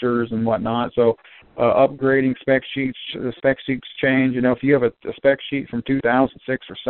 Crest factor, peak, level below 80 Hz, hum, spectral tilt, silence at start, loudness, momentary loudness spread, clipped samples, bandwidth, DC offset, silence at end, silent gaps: 16 dB; -4 dBFS; -52 dBFS; none; -5 dB/octave; 0 s; -20 LUFS; 9 LU; under 0.1%; 4.3 kHz; under 0.1%; 0 s; none